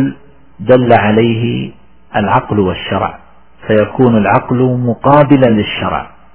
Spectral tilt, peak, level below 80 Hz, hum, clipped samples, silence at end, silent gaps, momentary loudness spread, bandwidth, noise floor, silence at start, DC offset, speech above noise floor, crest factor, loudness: -11 dB/octave; 0 dBFS; -38 dBFS; none; 0.4%; 0.25 s; none; 12 LU; 4 kHz; -36 dBFS; 0 s; 1%; 25 dB; 12 dB; -12 LUFS